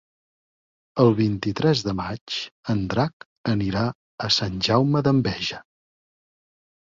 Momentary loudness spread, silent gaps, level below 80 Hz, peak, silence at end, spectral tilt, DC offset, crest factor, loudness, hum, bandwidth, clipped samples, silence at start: 10 LU; 2.21-2.27 s, 2.52-2.63 s, 3.13-3.20 s, 3.26-3.44 s, 3.95-4.18 s; -50 dBFS; -4 dBFS; 1.3 s; -6 dB/octave; under 0.1%; 20 dB; -23 LUFS; none; 7.6 kHz; under 0.1%; 0.95 s